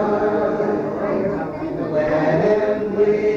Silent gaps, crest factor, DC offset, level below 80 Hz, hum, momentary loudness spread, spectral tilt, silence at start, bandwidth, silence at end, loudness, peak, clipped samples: none; 14 dB; under 0.1%; -48 dBFS; none; 6 LU; -8.5 dB/octave; 0 s; 6.8 kHz; 0 s; -20 LUFS; -6 dBFS; under 0.1%